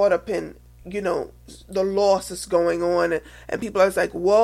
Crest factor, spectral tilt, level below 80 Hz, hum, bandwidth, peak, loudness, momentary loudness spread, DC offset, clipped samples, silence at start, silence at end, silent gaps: 16 dB; -5 dB/octave; -48 dBFS; none; 14.5 kHz; -6 dBFS; -23 LUFS; 11 LU; under 0.1%; under 0.1%; 0 s; 0 s; none